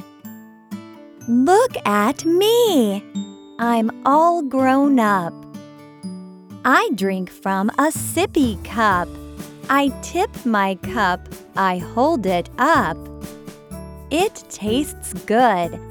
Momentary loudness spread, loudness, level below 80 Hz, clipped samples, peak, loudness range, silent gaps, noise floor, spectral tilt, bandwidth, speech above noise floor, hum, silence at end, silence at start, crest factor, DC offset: 20 LU; -19 LUFS; -46 dBFS; under 0.1%; -2 dBFS; 4 LU; none; -39 dBFS; -4.5 dB/octave; over 20 kHz; 21 dB; none; 0 s; 0 s; 16 dB; under 0.1%